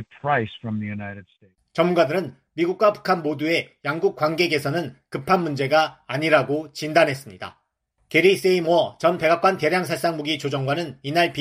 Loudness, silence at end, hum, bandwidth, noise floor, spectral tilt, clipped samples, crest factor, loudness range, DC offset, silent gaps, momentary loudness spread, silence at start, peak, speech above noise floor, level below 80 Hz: -22 LUFS; 0 s; none; 15 kHz; -70 dBFS; -5.5 dB/octave; under 0.1%; 18 dB; 3 LU; under 0.1%; none; 12 LU; 0 s; -4 dBFS; 49 dB; -64 dBFS